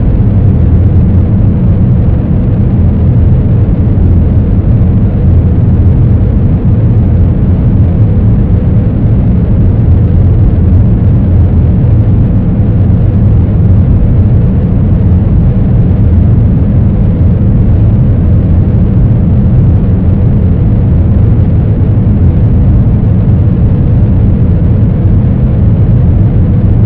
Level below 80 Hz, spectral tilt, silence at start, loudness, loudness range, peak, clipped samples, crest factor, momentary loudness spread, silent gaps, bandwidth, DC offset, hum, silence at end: -12 dBFS; -13 dB/octave; 0 s; -8 LUFS; 0 LU; 0 dBFS; 4%; 6 dB; 2 LU; none; 3.3 kHz; under 0.1%; none; 0 s